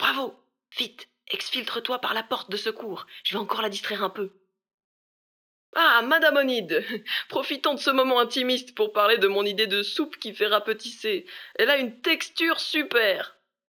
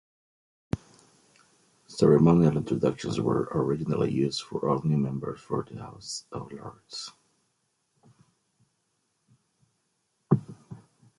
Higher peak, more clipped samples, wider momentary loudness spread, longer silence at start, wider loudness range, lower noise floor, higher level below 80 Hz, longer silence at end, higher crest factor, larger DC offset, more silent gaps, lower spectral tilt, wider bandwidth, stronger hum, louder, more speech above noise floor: about the same, -6 dBFS vs -8 dBFS; neither; second, 11 LU vs 21 LU; second, 0 s vs 0.75 s; second, 7 LU vs 18 LU; first, under -90 dBFS vs -75 dBFS; second, -86 dBFS vs -56 dBFS; about the same, 0.4 s vs 0.45 s; about the same, 20 dB vs 22 dB; neither; first, 4.74-4.78 s, 4.84-5.73 s vs none; second, -2.5 dB/octave vs -7 dB/octave; first, over 20 kHz vs 11.5 kHz; neither; first, -24 LUFS vs -27 LUFS; first, over 65 dB vs 49 dB